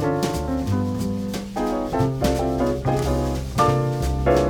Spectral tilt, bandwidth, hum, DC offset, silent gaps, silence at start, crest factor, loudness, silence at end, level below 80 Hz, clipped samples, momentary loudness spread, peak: -6.5 dB/octave; 19 kHz; none; under 0.1%; none; 0 s; 16 dB; -23 LUFS; 0 s; -32 dBFS; under 0.1%; 6 LU; -6 dBFS